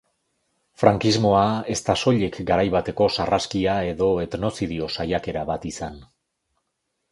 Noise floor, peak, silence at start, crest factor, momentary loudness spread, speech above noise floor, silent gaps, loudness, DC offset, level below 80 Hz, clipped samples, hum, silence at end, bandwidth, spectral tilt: -77 dBFS; 0 dBFS; 0.8 s; 22 dB; 9 LU; 55 dB; none; -22 LUFS; under 0.1%; -46 dBFS; under 0.1%; none; 1.1 s; 11.5 kHz; -5.5 dB/octave